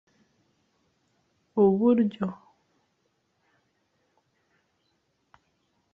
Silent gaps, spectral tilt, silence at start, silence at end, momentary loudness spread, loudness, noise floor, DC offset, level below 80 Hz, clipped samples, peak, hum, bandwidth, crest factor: none; -10.5 dB/octave; 1.55 s; 3.6 s; 13 LU; -24 LUFS; -74 dBFS; under 0.1%; -72 dBFS; under 0.1%; -10 dBFS; none; 4 kHz; 22 dB